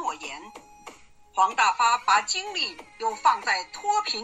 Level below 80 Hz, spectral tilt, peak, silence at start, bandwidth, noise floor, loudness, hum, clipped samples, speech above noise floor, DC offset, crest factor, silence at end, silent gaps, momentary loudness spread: -66 dBFS; 1 dB/octave; -8 dBFS; 0 s; 13 kHz; -48 dBFS; -24 LUFS; none; under 0.1%; 24 dB; under 0.1%; 18 dB; 0 s; none; 12 LU